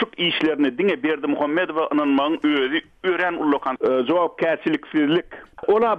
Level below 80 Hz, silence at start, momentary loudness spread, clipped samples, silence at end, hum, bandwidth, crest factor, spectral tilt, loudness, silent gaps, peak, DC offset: -60 dBFS; 0 s; 4 LU; under 0.1%; 0 s; none; 5.4 kHz; 14 dB; -7 dB/octave; -21 LUFS; none; -8 dBFS; under 0.1%